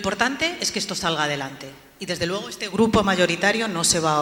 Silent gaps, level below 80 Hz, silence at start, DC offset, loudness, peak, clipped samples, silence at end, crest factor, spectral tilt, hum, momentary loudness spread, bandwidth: none; -48 dBFS; 0 s; under 0.1%; -22 LUFS; -4 dBFS; under 0.1%; 0 s; 20 dB; -3 dB/octave; none; 12 LU; 17.5 kHz